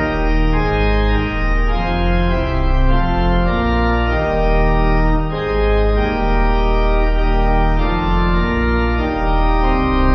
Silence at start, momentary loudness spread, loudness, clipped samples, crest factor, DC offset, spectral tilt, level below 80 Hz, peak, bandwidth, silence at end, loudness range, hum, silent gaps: 0 s; 2 LU; -17 LUFS; under 0.1%; 12 dB; under 0.1%; -8.5 dB/octave; -16 dBFS; -2 dBFS; 6 kHz; 0 s; 1 LU; none; none